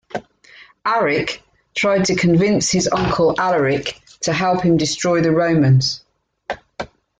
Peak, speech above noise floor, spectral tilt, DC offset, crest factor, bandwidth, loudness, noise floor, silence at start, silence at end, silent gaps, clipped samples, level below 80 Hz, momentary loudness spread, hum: -4 dBFS; 30 dB; -5 dB/octave; under 0.1%; 14 dB; 9.4 kHz; -17 LUFS; -46 dBFS; 0.15 s; 0.35 s; none; under 0.1%; -46 dBFS; 16 LU; none